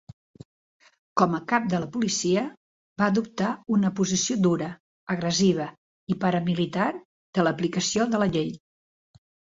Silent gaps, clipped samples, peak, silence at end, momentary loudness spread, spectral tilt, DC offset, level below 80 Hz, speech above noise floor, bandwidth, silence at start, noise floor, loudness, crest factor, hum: 2.57-2.96 s, 4.80-5.07 s, 5.78-6.07 s, 7.05-7.33 s; under 0.1%; -4 dBFS; 0.95 s; 12 LU; -5 dB/octave; under 0.1%; -62 dBFS; over 66 dB; 7.8 kHz; 1.15 s; under -90 dBFS; -25 LUFS; 22 dB; none